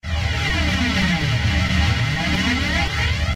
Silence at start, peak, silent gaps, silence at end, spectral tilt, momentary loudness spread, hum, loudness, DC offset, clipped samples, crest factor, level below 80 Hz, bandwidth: 0.05 s; -6 dBFS; none; 0 s; -4.5 dB/octave; 2 LU; none; -19 LUFS; 0.2%; under 0.1%; 12 dB; -26 dBFS; 15 kHz